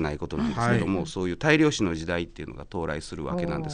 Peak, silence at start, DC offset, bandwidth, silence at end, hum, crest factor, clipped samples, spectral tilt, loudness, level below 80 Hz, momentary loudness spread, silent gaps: -8 dBFS; 0 s; under 0.1%; 10 kHz; 0 s; none; 18 dB; under 0.1%; -5.5 dB/octave; -26 LUFS; -44 dBFS; 12 LU; none